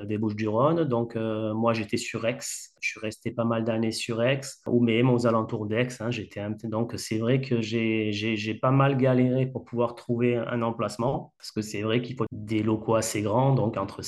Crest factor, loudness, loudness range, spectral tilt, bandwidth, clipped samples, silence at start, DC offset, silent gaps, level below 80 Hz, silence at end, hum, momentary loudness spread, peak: 16 dB; -27 LUFS; 3 LU; -6 dB/octave; 12.5 kHz; under 0.1%; 0 s; under 0.1%; none; -64 dBFS; 0 s; none; 9 LU; -10 dBFS